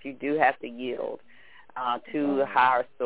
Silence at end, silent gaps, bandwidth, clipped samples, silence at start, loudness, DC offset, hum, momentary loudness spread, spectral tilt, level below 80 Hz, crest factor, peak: 0 s; none; 4 kHz; under 0.1%; 0.05 s; -26 LUFS; 0.3%; none; 14 LU; -8.5 dB/octave; -70 dBFS; 20 dB; -8 dBFS